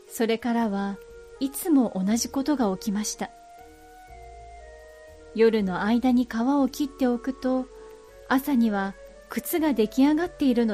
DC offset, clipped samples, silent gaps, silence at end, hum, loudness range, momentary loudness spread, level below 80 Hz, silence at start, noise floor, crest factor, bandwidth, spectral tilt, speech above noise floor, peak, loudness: under 0.1%; under 0.1%; none; 0 s; none; 4 LU; 18 LU; -52 dBFS; 0.1 s; -48 dBFS; 16 dB; 15.5 kHz; -5 dB/octave; 24 dB; -10 dBFS; -25 LUFS